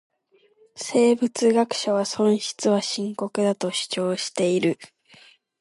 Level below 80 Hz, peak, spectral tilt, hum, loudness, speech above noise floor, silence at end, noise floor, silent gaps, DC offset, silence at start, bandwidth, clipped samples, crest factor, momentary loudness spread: -74 dBFS; -6 dBFS; -4.5 dB/octave; none; -23 LUFS; 40 dB; 0.75 s; -62 dBFS; none; under 0.1%; 0.75 s; 11.5 kHz; under 0.1%; 16 dB; 7 LU